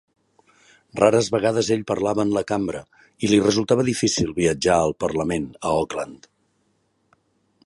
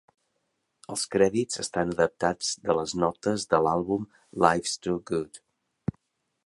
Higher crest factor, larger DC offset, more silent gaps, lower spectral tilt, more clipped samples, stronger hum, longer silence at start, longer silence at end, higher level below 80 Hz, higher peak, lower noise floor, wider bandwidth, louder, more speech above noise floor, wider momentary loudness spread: about the same, 20 dB vs 24 dB; neither; neither; about the same, -5 dB/octave vs -4.5 dB/octave; neither; neither; about the same, 0.95 s vs 0.9 s; first, 1.5 s vs 1.1 s; first, -50 dBFS vs -56 dBFS; about the same, -2 dBFS vs -4 dBFS; second, -67 dBFS vs -77 dBFS; about the same, 11.5 kHz vs 11.5 kHz; first, -21 LUFS vs -27 LUFS; second, 46 dB vs 51 dB; second, 10 LU vs 13 LU